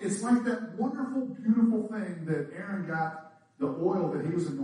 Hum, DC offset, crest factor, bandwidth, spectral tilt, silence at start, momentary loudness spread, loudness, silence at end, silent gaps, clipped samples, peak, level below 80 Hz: none; under 0.1%; 16 dB; 10.5 kHz; -7 dB/octave; 0 s; 10 LU; -30 LUFS; 0 s; none; under 0.1%; -14 dBFS; -76 dBFS